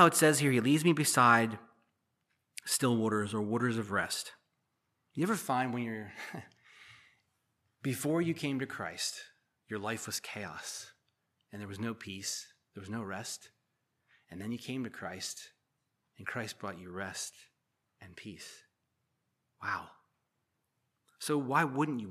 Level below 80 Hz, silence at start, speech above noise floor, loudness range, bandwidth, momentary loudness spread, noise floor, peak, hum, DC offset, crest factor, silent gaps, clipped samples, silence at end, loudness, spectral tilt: -78 dBFS; 0 s; 50 dB; 13 LU; 15 kHz; 20 LU; -82 dBFS; -8 dBFS; none; under 0.1%; 26 dB; none; under 0.1%; 0 s; -33 LUFS; -4 dB/octave